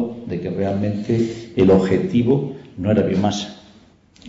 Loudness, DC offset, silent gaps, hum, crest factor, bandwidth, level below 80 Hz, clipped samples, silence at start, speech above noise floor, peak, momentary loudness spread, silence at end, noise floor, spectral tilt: -19 LUFS; under 0.1%; none; none; 14 dB; 7.8 kHz; -50 dBFS; under 0.1%; 0 s; 32 dB; -4 dBFS; 12 LU; 0 s; -50 dBFS; -7.5 dB/octave